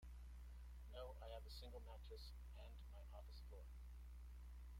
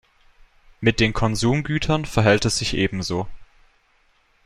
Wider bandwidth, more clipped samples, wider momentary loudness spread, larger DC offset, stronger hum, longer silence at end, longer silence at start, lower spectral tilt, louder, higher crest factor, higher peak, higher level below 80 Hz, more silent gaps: first, 16 kHz vs 13.5 kHz; neither; second, 4 LU vs 9 LU; neither; first, 60 Hz at -55 dBFS vs none; second, 0 s vs 1 s; second, 0 s vs 0.8 s; about the same, -5.5 dB/octave vs -5 dB/octave; second, -59 LUFS vs -21 LUFS; second, 14 dB vs 20 dB; second, -42 dBFS vs -4 dBFS; second, -58 dBFS vs -38 dBFS; neither